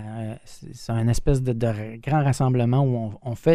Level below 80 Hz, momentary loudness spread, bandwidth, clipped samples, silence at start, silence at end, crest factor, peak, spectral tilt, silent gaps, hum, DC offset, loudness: -36 dBFS; 14 LU; 13 kHz; under 0.1%; 0 s; 0 s; 18 dB; -4 dBFS; -7.5 dB/octave; none; none; 0.3%; -24 LUFS